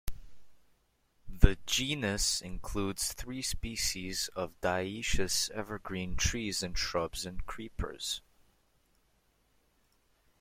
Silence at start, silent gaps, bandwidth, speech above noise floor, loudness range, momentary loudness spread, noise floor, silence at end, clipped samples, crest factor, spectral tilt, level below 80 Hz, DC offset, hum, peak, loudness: 0.05 s; none; 16.5 kHz; 39 dB; 7 LU; 10 LU; -71 dBFS; 2.2 s; under 0.1%; 32 dB; -3 dB/octave; -38 dBFS; under 0.1%; none; -2 dBFS; -33 LUFS